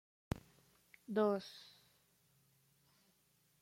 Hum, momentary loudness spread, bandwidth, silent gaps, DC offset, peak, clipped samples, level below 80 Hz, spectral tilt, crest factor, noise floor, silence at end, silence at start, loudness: none; 24 LU; 16.5 kHz; none; under 0.1%; -22 dBFS; under 0.1%; -68 dBFS; -6.5 dB/octave; 24 dB; -76 dBFS; 2 s; 0.35 s; -40 LUFS